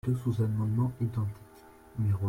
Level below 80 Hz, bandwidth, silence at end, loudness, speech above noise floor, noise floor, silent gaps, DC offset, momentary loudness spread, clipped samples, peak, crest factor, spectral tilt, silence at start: -56 dBFS; 15.5 kHz; 0 s; -31 LUFS; 25 dB; -54 dBFS; none; under 0.1%; 11 LU; under 0.1%; -18 dBFS; 12 dB; -9.5 dB/octave; 0.05 s